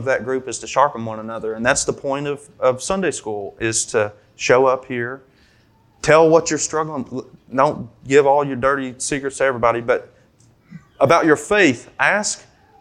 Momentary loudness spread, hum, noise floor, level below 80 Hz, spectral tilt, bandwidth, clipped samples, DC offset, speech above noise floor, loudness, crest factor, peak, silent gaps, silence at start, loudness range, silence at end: 13 LU; none; -55 dBFS; -50 dBFS; -4 dB/octave; 12 kHz; under 0.1%; under 0.1%; 37 dB; -18 LUFS; 18 dB; 0 dBFS; none; 0 s; 3 LU; 0.4 s